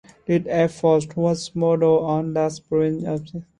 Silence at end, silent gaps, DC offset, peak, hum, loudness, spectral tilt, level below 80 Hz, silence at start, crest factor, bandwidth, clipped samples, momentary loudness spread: 0.15 s; none; under 0.1%; -6 dBFS; none; -21 LUFS; -7 dB/octave; -56 dBFS; 0.3 s; 16 dB; 10.5 kHz; under 0.1%; 6 LU